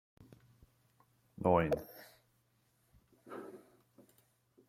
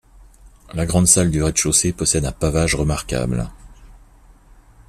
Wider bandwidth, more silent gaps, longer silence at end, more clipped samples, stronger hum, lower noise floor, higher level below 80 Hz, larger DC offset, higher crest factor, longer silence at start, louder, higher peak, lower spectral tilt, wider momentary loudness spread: about the same, 16 kHz vs 15.5 kHz; neither; first, 1.1 s vs 0.9 s; neither; neither; first, -75 dBFS vs -48 dBFS; second, -66 dBFS vs -34 dBFS; neither; first, 26 dB vs 20 dB; first, 1.4 s vs 0.45 s; second, -34 LUFS vs -18 LUFS; second, -14 dBFS vs 0 dBFS; first, -8 dB/octave vs -4 dB/octave; first, 26 LU vs 12 LU